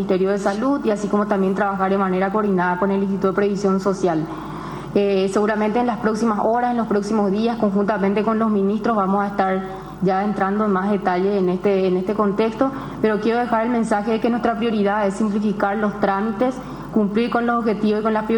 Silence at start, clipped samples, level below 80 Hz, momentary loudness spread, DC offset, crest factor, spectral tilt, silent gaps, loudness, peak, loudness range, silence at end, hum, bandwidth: 0 s; under 0.1%; -48 dBFS; 3 LU; under 0.1%; 16 dB; -7 dB/octave; none; -20 LUFS; -4 dBFS; 1 LU; 0 s; none; 17.5 kHz